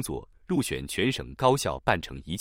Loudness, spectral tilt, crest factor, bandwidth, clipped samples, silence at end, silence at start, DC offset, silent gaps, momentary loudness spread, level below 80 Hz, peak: -28 LUFS; -4.5 dB/octave; 20 dB; 16.5 kHz; under 0.1%; 0 s; 0 s; under 0.1%; none; 11 LU; -48 dBFS; -8 dBFS